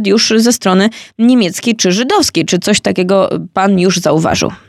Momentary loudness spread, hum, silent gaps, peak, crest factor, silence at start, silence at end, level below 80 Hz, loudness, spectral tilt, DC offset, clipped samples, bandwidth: 4 LU; none; none; 0 dBFS; 10 dB; 0 s; 0.1 s; -50 dBFS; -11 LUFS; -4 dB/octave; under 0.1%; under 0.1%; 14.5 kHz